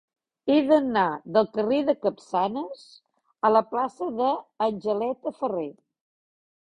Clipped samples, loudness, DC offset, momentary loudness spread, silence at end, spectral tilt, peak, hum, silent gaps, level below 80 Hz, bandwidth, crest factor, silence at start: under 0.1%; -25 LUFS; under 0.1%; 11 LU; 1.05 s; -7 dB/octave; -6 dBFS; none; none; -68 dBFS; 10 kHz; 20 dB; 0.45 s